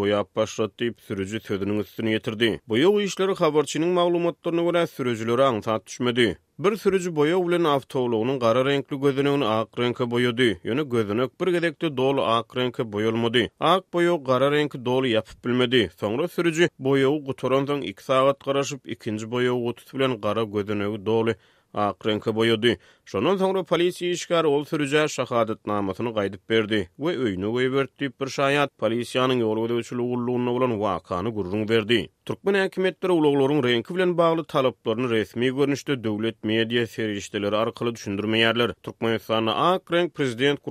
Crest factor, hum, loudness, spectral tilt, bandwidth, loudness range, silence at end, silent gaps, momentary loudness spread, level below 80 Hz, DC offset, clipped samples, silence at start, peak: 20 dB; none; -24 LUFS; -5.5 dB/octave; 15 kHz; 2 LU; 0 s; none; 7 LU; -62 dBFS; under 0.1%; under 0.1%; 0 s; -4 dBFS